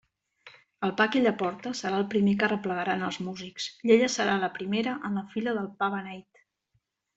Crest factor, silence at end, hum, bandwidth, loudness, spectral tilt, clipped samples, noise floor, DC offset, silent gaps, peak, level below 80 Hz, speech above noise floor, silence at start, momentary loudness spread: 20 dB; 0.95 s; none; 8 kHz; -28 LUFS; -5 dB/octave; under 0.1%; -75 dBFS; under 0.1%; none; -8 dBFS; -70 dBFS; 48 dB; 0.45 s; 12 LU